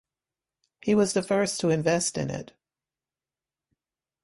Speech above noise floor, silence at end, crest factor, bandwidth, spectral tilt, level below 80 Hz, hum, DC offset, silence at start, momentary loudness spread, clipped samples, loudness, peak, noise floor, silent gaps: over 65 dB; 1.8 s; 18 dB; 11.5 kHz; -4.5 dB/octave; -64 dBFS; none; under 0.1%; 0.85 s; 10 LU; under 0.1%; -25 LUFS; -10 dBFS; under -90 dBFS; none